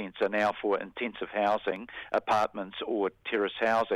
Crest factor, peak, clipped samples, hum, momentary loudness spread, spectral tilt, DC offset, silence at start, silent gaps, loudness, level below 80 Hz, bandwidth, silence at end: 16 dB; -14 dBFS; under 0.1%; none; 8 LU; -5 dB/octave; under 0.1%; 0 s; none; -30 LUFS; -66 dBFS; 12.5 kHz; 0 s